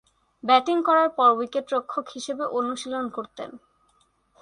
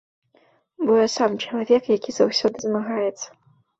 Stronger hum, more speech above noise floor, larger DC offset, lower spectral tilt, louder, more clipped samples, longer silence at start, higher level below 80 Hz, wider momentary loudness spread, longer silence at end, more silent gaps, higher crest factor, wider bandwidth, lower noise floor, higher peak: neither; about the same, 42 dB vs 40 dB; neither; about the same, -3 dB/octave vs -4 dB/octave; about the same, -23 LUFS vs -21 LUFS; neither; second, 0.45 s vs 0.8 s; second, -72 dBFS vs -66 dBFS; first, 15 LU vs 8 LU; first, 0.85 s vs 0.5 s; neither; about the same, 20 dB vs 18 dB; first, 11 kHz vs 8 kHz; first, -66 dBFS vs -61 dBFS; about the same, -4 dBFS vs -6 dBFS